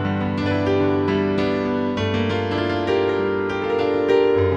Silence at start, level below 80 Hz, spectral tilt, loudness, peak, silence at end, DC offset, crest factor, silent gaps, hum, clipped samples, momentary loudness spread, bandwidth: 0 s; -48 dBFS; -7.5 dB/octave; -21 LUFS; -6 dBFS; 0 s; under 0.1%; 14 dB; none; none; under 0.1%; 5 LU; 7.8 kHz